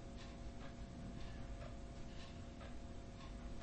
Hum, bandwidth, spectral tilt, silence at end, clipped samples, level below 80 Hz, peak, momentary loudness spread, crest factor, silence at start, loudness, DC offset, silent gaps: none; 8.4 kHz; -6 dB/octave; 0 s; under 0.1%; -54 dBFS; -38 dBFS; 2 LU; 12 dB; 0 s; -53 LUFS; under 0.1%; none